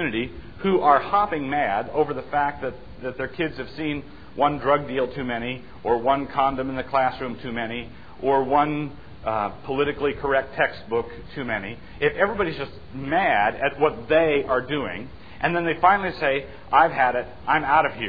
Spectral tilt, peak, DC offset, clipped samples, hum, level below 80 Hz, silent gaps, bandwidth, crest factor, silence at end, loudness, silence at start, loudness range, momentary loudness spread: -8.5 dB/octave; -2 dBFS; 0.7%; under 0.1%; none; -48 dBFS; none; 5 kHz; 20 dB; 0 s; -23 LUFS; 0 s; 4 LU; 14 LU